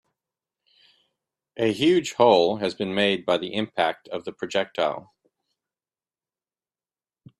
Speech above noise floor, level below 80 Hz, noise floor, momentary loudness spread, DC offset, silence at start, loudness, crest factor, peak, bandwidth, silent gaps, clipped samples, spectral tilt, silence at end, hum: over 67 dB; -68 dBFS; under -90 dBFS; 14 LU; under 0.1%; 1.55 s; -23 LUFS; 22 dB; -4 dBFS; 12 kHz; none; under 0.1%; -5 dB/octave; 2.4 s; none